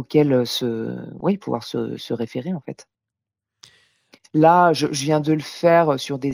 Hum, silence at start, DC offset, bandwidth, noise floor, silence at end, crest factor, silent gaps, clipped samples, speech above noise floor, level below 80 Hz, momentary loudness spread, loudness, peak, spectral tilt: none; 0 s; under 0.1%; over 20 kHz; -86 dBFS; 0 s; 20 dB; none; under 0.1%; 66 dB; -64 dBFS; 13 LU; -20 LUFS; -2 dBFS; -6 dB/octave